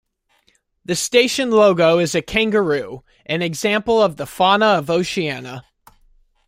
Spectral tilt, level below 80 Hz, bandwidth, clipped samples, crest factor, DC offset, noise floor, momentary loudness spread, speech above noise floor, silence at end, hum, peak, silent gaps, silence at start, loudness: -4 dB/octave; -50 dBFS; 16 kHz; under 0.1%; 18 dB; under 0.1%; -62 dBFS; 16 LU; 45 dB; 0.85 s; none; -2 dBFS; none; 0.9 s; -17 LUFS